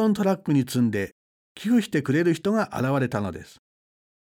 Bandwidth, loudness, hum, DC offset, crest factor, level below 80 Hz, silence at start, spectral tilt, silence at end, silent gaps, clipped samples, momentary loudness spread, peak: 17 kHz; -24 LUFS; none; under 0.1%; 14 dB; -62 dBFS; 0 s; -6.5 dB/octave; 0.95 s; 1.12-1.55 s; under 0.1%; 11 LU; -10 dBFS